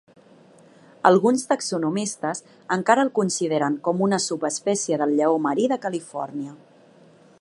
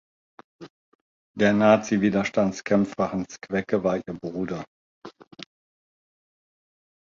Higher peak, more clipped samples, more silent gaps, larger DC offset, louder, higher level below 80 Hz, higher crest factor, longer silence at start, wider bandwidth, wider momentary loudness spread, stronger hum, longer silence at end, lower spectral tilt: first, 0 dBFS vs -4 dBFS; neither; second, none vs 0.70-1.34 s, 4.67-5.02 s; neither; about the same, -22 LUFS vs -24 LUFS; second, -74 dBFS vs -60 dBFS; about the same, 22 dB vs 22 dB; first, 1.05 s vs 0.6 s; first, 11.5 kHz vs 7.4 kHz; second, 11 LU vs 25 LU; neither; second, 0.85 s vs 1.55 s; second, -4.5 dB/octave vs -6.5 dB/octave